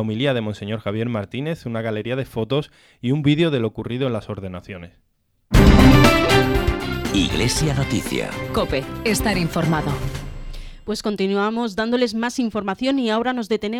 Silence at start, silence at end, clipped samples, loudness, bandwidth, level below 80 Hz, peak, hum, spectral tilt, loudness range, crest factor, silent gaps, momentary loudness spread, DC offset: 0 s; 0 s; under 0.1%; -20 LUFS; 18.5 kHz; -28 dBFS; 0 dBFS; none; -5.5 dB/octave; 7 LU; 20 dB; none; 15 LU; under 0.1%